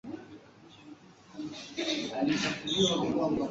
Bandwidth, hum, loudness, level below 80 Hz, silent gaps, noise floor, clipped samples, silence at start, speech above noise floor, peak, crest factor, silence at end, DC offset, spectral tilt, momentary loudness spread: 8 kHz; none; -30 LUFS; -62 dBFS; none; -54 dBFS; under 0.1%; 0.05 s; 24 dB; -14 dBFS; 20 dB; 0 s; under 0.1%; -4 dB/octave; 24 LU